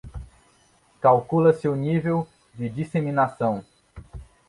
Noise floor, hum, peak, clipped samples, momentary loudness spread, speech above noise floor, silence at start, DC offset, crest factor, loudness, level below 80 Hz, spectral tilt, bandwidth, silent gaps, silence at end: -60 dBFS; none; -4 dBFS; under 0.1%; 22 LU; 38 dB; 0.05 s; under 0.1%; 20 dB; -23 LUFS; -48 dBFS; -9 dB/octave; 11 kHz; none; 0.25 s